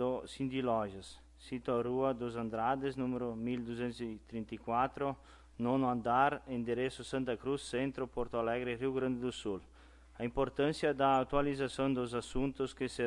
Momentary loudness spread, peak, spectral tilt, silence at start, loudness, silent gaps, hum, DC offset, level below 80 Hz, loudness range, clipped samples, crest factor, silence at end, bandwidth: 11 LU; -16 dBFS; -6 dB/octave; 0 s; -36 LUFS; none; none; under 0.1%; -56 dBFS; 3 LU; under 0.1%; 20 dB; 0 s; 11.5 kHz